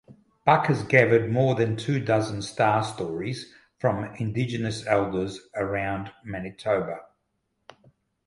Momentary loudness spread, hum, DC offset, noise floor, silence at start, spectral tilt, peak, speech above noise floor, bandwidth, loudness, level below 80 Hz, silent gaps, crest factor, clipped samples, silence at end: 13 LU; none; under 0.1%; -76 dBFS; 0.1 s; -6.5 dB/octave; -2 dBFS; 51 dB; 11.5 kHz; -25 LUFS; -56 dBFS; none; 24 dB; under 0.1%; 1.2 s